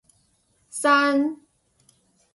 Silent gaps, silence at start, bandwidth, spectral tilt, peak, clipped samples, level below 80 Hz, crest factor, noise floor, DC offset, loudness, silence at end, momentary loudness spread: none; 0.75 s; 11.5 kHz; -2 dB/octave; -6 dBFS; under 0.1%; -74 dBFS; 18 dB; -66 dBFS; under 0.1%; -21 LUFS; 1 s; 19 LU